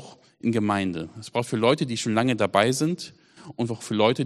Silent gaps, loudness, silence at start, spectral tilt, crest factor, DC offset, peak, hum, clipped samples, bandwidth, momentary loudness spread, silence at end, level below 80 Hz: none; -25 LUFS; 0 s; -5 dB/octave; 22 dB; under 0.1%; -4 dBFS; none; under 0.1%; 13 kHz; 11 LU; 0 s; -64 dBFS